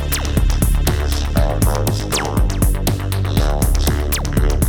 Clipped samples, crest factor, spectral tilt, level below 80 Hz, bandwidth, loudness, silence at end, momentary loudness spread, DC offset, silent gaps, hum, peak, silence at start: under 0.1%; 14 dB; -5 dB/octave; -18 dBFS; over 20 kHz; -18 LUFS; 0 s; 2 LU; under 0.1%; none; none; 0 dBFS; 0 s